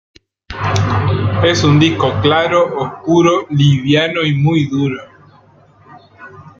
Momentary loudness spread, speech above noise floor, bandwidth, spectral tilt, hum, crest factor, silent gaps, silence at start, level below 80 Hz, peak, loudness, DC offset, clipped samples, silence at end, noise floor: 8 LU; 34 dB; 7.6 kHz; -6 dB/octave; none; 14 dB; none; 0.5 s; -42 dBFS; 0 dBFS; -13 LUFS; under 0.1%; under 0.1%; 0.1 s; -46 dBFS